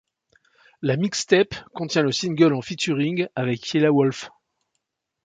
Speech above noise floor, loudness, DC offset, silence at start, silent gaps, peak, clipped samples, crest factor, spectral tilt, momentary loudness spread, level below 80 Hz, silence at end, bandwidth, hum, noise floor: 57 dB; -22 LUFS; under 0.1%; 0.8 s; none; -2 dBFS; under 0.1%; 20 dB; -5 dB/octave; 8 LU; -62 dBFS; 0.95 s; 9.4 kHz; none; -78 dBFS